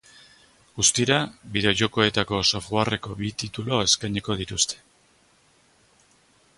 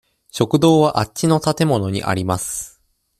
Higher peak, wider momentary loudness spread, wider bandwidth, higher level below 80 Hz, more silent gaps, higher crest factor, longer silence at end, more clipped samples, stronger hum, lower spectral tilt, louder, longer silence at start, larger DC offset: second, -4 dBFS vs 0 dBFS; second, 10 LU vs 13 LU; second, 11.5 kHz vs 15 kHz; about the same, -50 dBFS vs -50 dBFS; neither; about the same, 22 dB vs 18 dB; first, 1.8 s vs 0.5 s; neither; neither; second, -3 dB/octave vs -5.5 dB/octave; second, -23 LUFS vs -18 LUFS; first, 0.75 s vs 0.35 s; neither